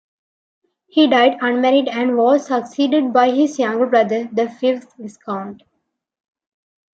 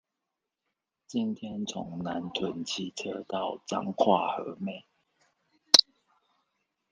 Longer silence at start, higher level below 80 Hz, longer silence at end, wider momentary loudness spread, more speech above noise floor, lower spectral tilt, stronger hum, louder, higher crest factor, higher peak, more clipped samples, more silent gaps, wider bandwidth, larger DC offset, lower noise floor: second, 0.95 s vs 1.1 s; about the same, -72 dBFS vs -72 dBFS; first, 1.4 s vs 1.1 s; second, 13 LU vs 17 LU; about the same, 57 dB vs 55 dB; first, -5 dB/octave vs -3 dB/octave; neither; first, -17 LUFS vs -28 LUFS; second, 16 dB vs 32 dB; about the same, -2 dBFS vs 0 dBFS; neither; neither; second, 8 kHz vs 10 kHz; neither; second, -73 dBFS vs -86 dBFS